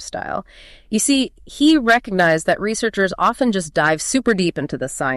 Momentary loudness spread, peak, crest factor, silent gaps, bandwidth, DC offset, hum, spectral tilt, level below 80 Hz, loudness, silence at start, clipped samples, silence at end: 11 LU; -4 dBFS; 14 dB; none; 13 kHz; under 0.1%; none; -4 dB/octave; -46 dBFS; -18 LUFS; 0 s; under 0.1%; 0 s